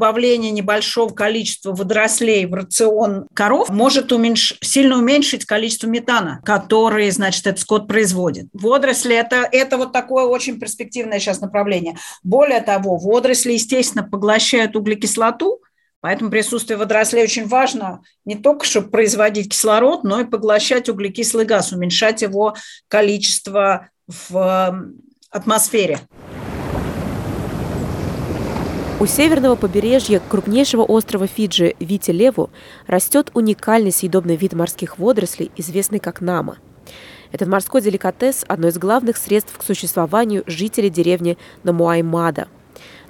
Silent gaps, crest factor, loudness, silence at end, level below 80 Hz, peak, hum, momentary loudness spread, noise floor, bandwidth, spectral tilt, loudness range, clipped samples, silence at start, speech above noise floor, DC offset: 15.96-16.02 s; 16 dB; -16 LUFS; 0.15 s; -46 dBFS; -2 dBFS; none; 10 LU; -42 dBFS; 18 kHz; -3.5 dB/octave; 5 LU; under 0.1%; 0 s; 25 dB; under 0.1%